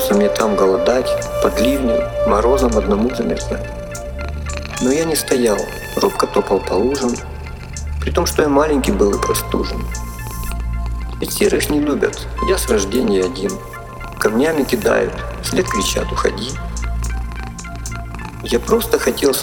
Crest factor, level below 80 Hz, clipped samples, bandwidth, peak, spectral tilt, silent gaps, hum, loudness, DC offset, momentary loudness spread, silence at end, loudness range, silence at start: 16 dB; -28 dBFS; under 0.1%; 20 kHz; -2 dBFS; -4.5 dB/octave; none; none; -18 LUFS; under 0.1%; 13 LU; 0 s; 3 LU; 0 s